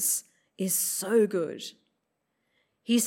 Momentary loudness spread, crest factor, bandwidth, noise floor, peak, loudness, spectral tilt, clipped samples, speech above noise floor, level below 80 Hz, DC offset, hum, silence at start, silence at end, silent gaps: 16 LU; 16 dB; 16.5 kHz; -79 dBFS; -12 dBFS; -27 LUFS; -3 dB/octave; under 0.1%; 51 dB; -88 dBFS; under 0.1%; none; 0 s; 0 s; none